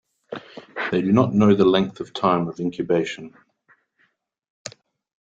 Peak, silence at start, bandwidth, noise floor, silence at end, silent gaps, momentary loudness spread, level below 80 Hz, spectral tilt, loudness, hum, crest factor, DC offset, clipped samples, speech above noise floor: -2 dBFS; 0.3 s; 7.8 kHz; -67 dBFS; 0.7 s; 4.50-4.65 s; 22 LU; -60 dBFS; -7 dB/octave; -20 LUFS; none; 20 dB; under 0.1%; under 0.1%; 47 dB